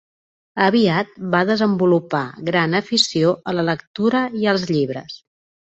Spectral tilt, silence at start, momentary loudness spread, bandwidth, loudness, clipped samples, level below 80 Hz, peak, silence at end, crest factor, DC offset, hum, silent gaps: -5 dB/octave; 0.55 s; 8 LU; 8.2 kHz; -19 LUFS; under 0.1%; -60 dBFS; -2 dBFS; 0.6 s; 16 dB; under 0.1%; none; 3.87-3.94 s